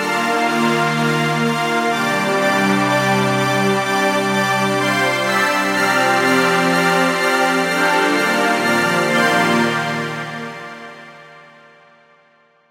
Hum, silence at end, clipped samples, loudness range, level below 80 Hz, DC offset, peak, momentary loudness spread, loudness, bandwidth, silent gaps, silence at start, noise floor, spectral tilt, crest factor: none; 1.3 s; under 0.1%; 4 LU; -62 dBFS; under 0.1%; -2 dBFS; 6 LU; -16 LUFS; 16 kHz; none; 0 s; -55 dBFS; -4 dB/octave; 14 dB